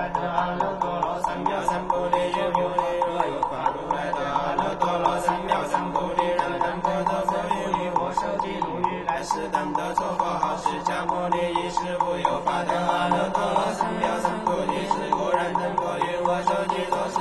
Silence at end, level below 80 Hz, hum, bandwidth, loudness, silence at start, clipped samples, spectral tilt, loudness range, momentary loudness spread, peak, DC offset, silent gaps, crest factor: 0 s; -48 dBFS; none; 12 kHz; -25 LUFS; 0 s; under 0.1%; -5 dB/octave; 2 LU; 3 LU; -6 dBFS; under 0.1%; none; 18 dB